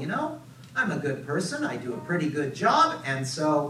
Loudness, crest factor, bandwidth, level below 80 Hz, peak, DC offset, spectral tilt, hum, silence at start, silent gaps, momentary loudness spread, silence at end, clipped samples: -27 LUFS; 18 dB; 15 kHz; -70 dBFS; -8 dBFS; under 0.1%; -5 dB/octave; none; 0 s; none; 11 LU; 0 s; under 0.1%